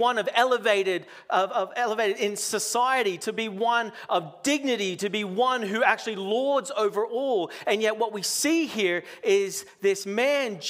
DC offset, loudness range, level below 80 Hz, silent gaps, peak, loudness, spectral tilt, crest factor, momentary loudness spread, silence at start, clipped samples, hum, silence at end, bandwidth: under 0.1%; 1 LU; -80 dBFS; none; -6 dBFS; -25 LUFS; -2.5 dB/octave; 20 dB; 5 LU; 0 s; under 0.1%; none; 0 s; 16 kHz